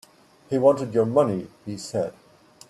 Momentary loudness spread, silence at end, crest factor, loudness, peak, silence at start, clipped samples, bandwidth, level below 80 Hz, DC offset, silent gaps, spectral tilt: 13 LU; 0.6 s; 18 dB; -23 LUFS; -6 dBFS; 0.5 s; under 0.1%; 12.5 kHz; -66 dBFS; under 0.1%; none; -7 dB/octave